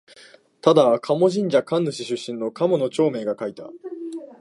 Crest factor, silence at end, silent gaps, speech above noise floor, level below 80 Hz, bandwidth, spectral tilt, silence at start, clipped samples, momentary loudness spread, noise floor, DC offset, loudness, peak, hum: 20 dB; 0.05 s; none; 30 dB; -74 dBFS; 11.5 kHz; -6 dB/octave; 0.65 s; under 0.1%; 17 LU; -50 dBFS; under 0.1%; -21 LUFS; -2 dBFS; none